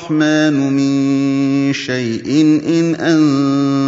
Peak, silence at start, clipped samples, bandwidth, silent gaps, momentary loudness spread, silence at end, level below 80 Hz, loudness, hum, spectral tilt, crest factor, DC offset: -2 dBFS; 0 s; under 0.1%; 7.8 kHz; none; 4 LU; 0 s; -60 dBFS; -14 LUFS; none; -6 dB/octave; 12 dB; under 0.1%